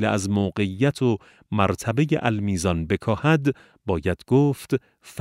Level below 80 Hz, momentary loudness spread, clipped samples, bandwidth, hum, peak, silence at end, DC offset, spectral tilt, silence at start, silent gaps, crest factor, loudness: -46 dBFS; 8 LU; under 0.1%; 15.5 kHz; none; -4 dBFS; 0 s; under 0.1%; -6.5 dB/octave; 0 s; none; 18 dB; -23 LUFS